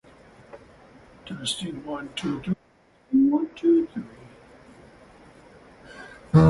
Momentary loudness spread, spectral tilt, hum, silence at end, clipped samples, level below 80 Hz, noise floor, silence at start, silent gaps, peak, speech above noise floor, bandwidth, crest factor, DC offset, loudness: 26 LU; -7 dB/octave; none; 0 s; under 0.1%; -46 dBFS; -59 dBFS; 0.55 s; none; -6 dBFS; 33 dB; 11.5 kHz; 20 dB; under 0.1%; -25 LUFS